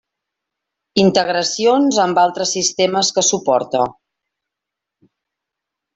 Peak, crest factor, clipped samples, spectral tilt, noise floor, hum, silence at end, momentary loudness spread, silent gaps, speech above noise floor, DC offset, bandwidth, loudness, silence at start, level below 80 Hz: -2 dBFS; 16 dB; under 0.1%; -3 dB/octave; -83 dBFS; none; 2.05 s; 5 LU; none; 68 dB; under 0.1%; 8.4 kHz; -16 LUFS; 0.95 s; -60 dBFS